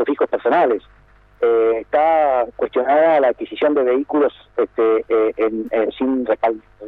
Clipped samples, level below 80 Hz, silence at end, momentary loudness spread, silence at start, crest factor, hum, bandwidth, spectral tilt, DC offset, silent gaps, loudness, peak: under 0.1%; -54 dBFS; 0 s; 6 LU; 0 s; 12 dB; none; 4.2 kHz; -7.5 dB/octave; under 0.1%; none; -18 LUFS; -6 dBFS